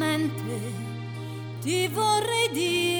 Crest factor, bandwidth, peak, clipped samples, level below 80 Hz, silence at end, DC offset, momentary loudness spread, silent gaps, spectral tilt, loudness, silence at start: 14 dB; over 20 kHz; -12 dBFS; under 0.1%; -66 dBFS; 0 s; under 0.1%; 12 LU; none; -4 dB/octave; -27 LUFS; 0 s